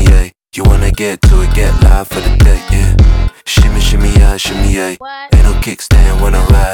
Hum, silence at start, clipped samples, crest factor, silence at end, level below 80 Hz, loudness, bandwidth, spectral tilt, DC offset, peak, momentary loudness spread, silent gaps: none; 0 s; 0.5%; 8 dB; 0 s; -8 dBFS; -11 LUFS; 16.5 kHz; -5.5 dB/octave; under 0.1%; 0 dBFS; 6 LU; none